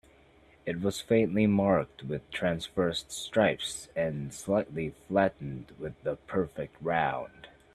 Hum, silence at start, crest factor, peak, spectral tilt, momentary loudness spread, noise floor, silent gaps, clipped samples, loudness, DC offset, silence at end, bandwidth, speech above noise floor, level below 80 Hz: none; 0.65 s; 20 dB; -10 dBFS; -5.5 dB/octave; 12 LU; -60 dBFS; none; under 0.1%; -30 LUFS; under 0.1%; 0.25 s; 13.5 kHz; 30 dB; -58 dBFS